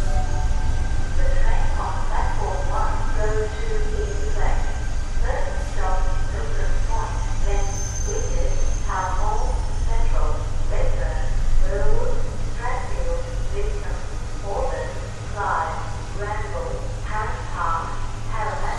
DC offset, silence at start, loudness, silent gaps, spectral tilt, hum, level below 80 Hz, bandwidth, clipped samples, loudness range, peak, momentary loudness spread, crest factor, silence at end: under 0.1%; 0 s; -27 LUFS; none; -5 dB/octave; none; -20 dBFS; 9.6 kHz; under 0.1%; 2 LU; -6 dBFS; 5 LU; 14 dB; 0 s